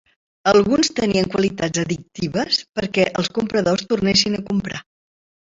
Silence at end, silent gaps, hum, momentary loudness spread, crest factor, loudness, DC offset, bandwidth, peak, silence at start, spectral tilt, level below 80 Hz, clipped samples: 0.75 s; 2.69-2.73 s; none; 8 LU; 20 dB; -19 LUFS; under 0.1%; 7.8 kHz; 0 dBFS; 0.45 s; -4.5 dB/octave; -50 dBFS; under 0.1%